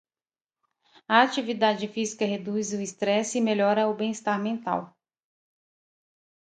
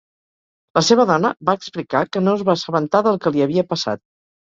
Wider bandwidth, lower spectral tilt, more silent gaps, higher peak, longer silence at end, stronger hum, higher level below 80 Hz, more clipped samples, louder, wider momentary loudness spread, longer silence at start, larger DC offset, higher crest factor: first, 9.4 kHz vs 7.8 kHz; about the same, -4 dB/octave vs -5 dB/octave; neither; about the same, -4 dBFS vs -2 dBFS; first, 1.65 s vs 0.45 s; neither; second, -76 dBFS vs -60 dBFS; neither; second, -26 LUFS vs -18 LUFS; about the same, 8 LU vs 8 LU; first, 1.1 s vs 0.75 s; neither; first, 24 dB vs 18 dB